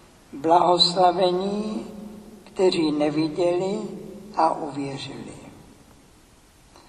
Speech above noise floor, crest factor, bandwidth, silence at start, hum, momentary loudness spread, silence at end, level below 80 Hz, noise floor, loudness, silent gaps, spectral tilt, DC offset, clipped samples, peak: 31 dB; 20 dB; 12 kHz; 0.35 s; none; 22 LU; 1.3 s; -58 dBFS; -53 dBFS; -22 LUFS; none; -5 dB/octave; under 0.1%; under 0.1%; -4 dBFS